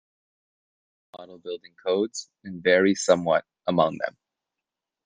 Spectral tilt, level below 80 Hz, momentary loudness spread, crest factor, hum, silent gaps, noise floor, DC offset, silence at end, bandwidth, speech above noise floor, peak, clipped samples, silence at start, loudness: -4.5 dB/octave; -72 dBFS; 17 LU; 22 dB; none; none; -87 dBFS; under 0.1%; 0.95 s; 10 kHz; 63 dB; -4 dBFS; under 0.1%; 1.15 s; -24 LUFS